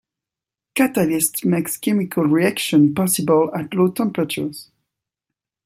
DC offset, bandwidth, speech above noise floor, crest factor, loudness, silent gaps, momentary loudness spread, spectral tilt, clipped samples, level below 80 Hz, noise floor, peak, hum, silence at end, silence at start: under 0.1%; 16.5 kHz; 69 dB; 18 dB; -19 LUFS; none; 8 LU; -5 dB/octave; under 0.1%; -62 dBFS; -87 dBFS; -2 dBFS; none; 1.05 s; 0.75 s